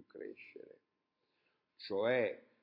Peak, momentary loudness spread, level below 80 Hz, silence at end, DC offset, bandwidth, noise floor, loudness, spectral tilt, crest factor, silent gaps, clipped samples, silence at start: -22 dBFS; 21 LU; under -90 dBFS; 0.25 s; under 0.1%; 5.6 kHz; -85 dBFS; -36 LUFS; -3 dB/octave; 20 dB; none; under 0.1%; 0.15 s